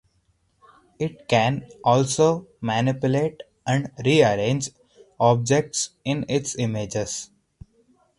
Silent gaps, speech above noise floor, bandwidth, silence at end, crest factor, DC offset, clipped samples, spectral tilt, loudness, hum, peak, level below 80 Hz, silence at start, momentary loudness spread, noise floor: none; 44 dB; 11.5 kHz; 0.95 s; 20 dB; under 0.1%; under 0.1%; -5 dB/octave; -23 LUFS; none; -4 dBFS; -56 dBFS; 1 s; 12 LU; -66 dBFS